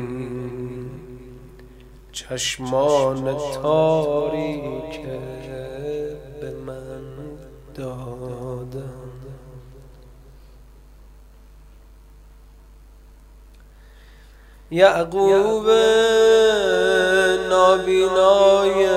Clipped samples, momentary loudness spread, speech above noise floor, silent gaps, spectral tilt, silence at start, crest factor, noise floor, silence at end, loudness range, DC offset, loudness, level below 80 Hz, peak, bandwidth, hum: under 0.1%; 21 LU; 28 dB; none; -4.5 dB/octave; 0 s; 22 dB; -46 dBFS; 0 s; 19 LU; under 0.1%; -18 LUFS; -46 dBFS; 0 dBFS; 15 kHz; 50 Hz at -45 dBFS